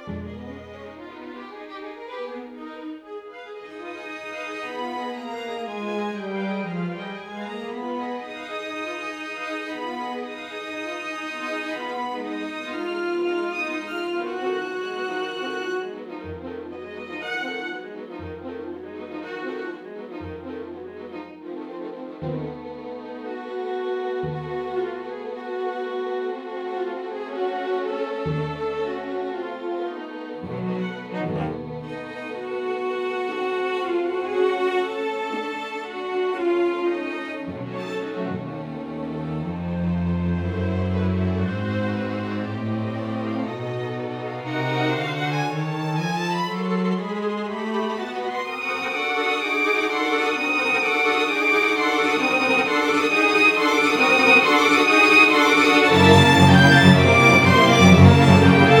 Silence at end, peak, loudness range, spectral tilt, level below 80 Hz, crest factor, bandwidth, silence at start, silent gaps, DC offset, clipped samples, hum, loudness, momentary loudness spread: 0 s; 0 dBFS; 19 LU; -5.5 dB/octave; -50 dBFS; 22 dB; 18.5 kHz; 0 s; none; under 0.1%; under 0.1%; none; -21 LUFS; 22 LU